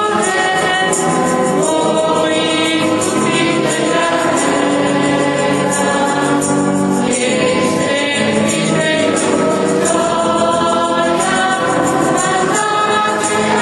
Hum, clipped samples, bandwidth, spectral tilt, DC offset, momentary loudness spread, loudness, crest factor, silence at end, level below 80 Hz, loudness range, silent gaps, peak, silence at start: none; under 0.1%; 12 kHz; -3.5 dB/octave; under 0.1%; 1 LU; -14 LUFS; 14 dB; 0 s; -50 dBFS; 0 LU; none; 0 dBFS; 0 s